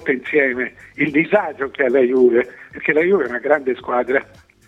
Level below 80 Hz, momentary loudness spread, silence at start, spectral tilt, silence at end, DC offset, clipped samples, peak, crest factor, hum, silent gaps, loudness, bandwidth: -58 dBFS; 9 LU; 0 s; -7.5 dB/octave; 0.45 s; under 0.1%; under 0.1%; 0 dBFS; 18 dB; none; none; -18 LUFS; 5.8 kHz